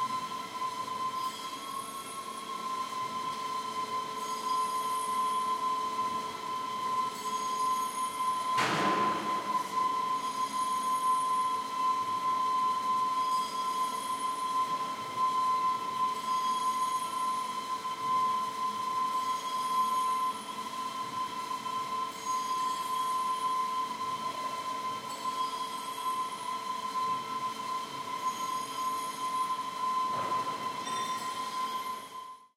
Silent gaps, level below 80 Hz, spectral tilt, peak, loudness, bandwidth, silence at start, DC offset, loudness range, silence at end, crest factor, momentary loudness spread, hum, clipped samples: none; -78 dBFS; -2 dB/octave; -16 dBFS; -32 LUFS; 16 kHz; 0 s; under 0.1%; 4 LU; 0.1 s; 16 dB; 7 LU; none; under 0.1%